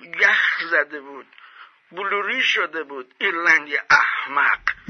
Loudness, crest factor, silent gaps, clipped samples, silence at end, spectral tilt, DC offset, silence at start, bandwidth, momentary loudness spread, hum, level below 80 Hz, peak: -19 LUFS; 18 dB; none; under 0.1%; 0.15 s; -1.5 dB/octave; under 0.1%; 0 s; 6.6 kHz; 14 LU; none; -62 dBFS; -4 dBFS